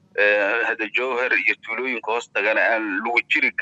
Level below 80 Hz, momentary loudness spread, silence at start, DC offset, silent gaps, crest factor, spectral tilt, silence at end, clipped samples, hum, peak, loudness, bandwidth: -80 dBFS; 7 LU; 0.15 s; under 0.1%; none; 18 dB; -3 dB/octave; 0 s; under 0.1%; none; -4 dBFS; -20 LUFS; 8.2 kHz